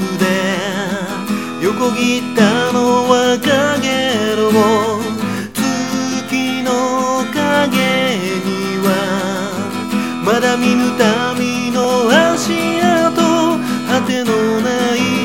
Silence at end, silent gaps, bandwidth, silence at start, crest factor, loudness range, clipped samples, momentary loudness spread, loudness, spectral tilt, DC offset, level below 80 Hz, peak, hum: 0 s; none; 17 kHz; 0 s; 14 dB; 3 LU; under 0.1%; 7 LU; -15 LUFS; -4.5 dB/octave; 0.5%; -54 dBFS; 0 dBFS; none